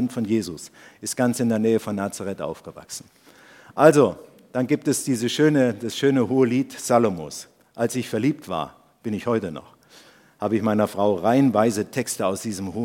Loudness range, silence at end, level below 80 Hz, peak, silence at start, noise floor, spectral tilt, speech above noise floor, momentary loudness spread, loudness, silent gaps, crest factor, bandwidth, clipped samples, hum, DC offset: 6 LU; 0 s; -64 dBFS; 0 dBFS; 0 s; -51 dBFS; -5.5 dB/octave; 29 dB; 17 LU; -22 LUFS; none; 22 dB; 17 kHz; under 0.1%; none; under 0.1%